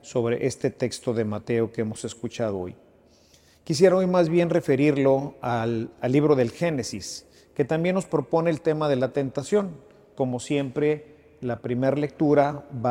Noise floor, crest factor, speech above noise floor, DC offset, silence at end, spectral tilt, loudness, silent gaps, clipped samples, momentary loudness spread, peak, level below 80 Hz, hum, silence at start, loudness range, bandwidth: -57 dBFS; 20 dB; 33 dB; under 0.1%; 0 s; -6.5 dB/octave; -24 LUFS; none; under 0.1%; 11 LU; -4 dBFS; -60 dBFS; none; 0.05 s; 5 LU; 15.5 kHz